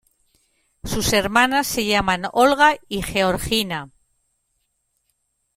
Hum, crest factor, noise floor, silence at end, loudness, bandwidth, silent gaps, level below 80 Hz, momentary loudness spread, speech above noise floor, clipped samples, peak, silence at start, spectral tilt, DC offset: none; 20 dB; -71 dBFS; 1.7 s; -19 LUFS; 16.5 kHz; none; -42 dBFS; 11 LU; 52 dB; under 0.1%; -2 dBFS; 0.85 s; -3 dB/octave; under 0.1%